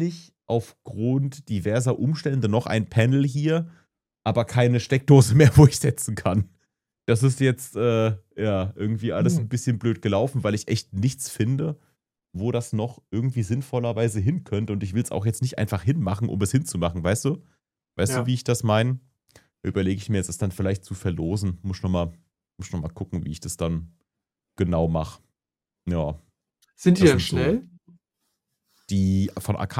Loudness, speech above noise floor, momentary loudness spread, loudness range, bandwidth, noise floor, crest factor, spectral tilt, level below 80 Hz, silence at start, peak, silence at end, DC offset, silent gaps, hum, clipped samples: -24 LUFS; 67 dB; 11 LU; 10 LU; 15 kHz; -89 dBFS; 22 dB; -6.5 dB/octave; -46 dBFS; 0 s; -2 dBFS; 0 s; under 0.1%; none; none; under 0.1%